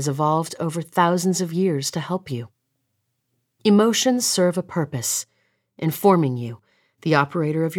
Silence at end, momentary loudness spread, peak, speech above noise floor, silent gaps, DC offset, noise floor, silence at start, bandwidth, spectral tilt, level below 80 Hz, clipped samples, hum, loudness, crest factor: 0 s; 12 LU; -4 dBFS; 53 dB; none; under 0.1%; -74 dBFS; 0 s; 19.5 kHz; -5 dB/octave; -70 dBFS; under 0.1%; none; -21 LUFS; 18 dB